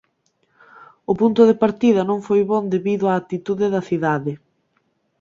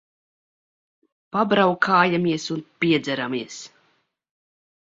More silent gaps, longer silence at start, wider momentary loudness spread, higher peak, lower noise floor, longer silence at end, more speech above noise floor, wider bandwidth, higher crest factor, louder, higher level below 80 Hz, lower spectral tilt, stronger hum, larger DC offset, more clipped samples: neither; second, 0.8 s vs 1.35 s; about the same, 11 LU vs 12 LU; about the same, -2 dBFS vs -2 dBFS; about the same, -67 dBFS vs -67 dBFS; second, 0.85 s vs 1.2 s; about the same, 49 dB vs 46 dB; about the same, 7.6 kHz vs 7.8 kHz; second, 16 dB vs 22 dB; about the same, -19 LUFS vs -21 LUFS; first, -60 dBFS vs -66 dBFS; first, -8 dB/octave vs -5.5 dB/octave; neither; neither; neither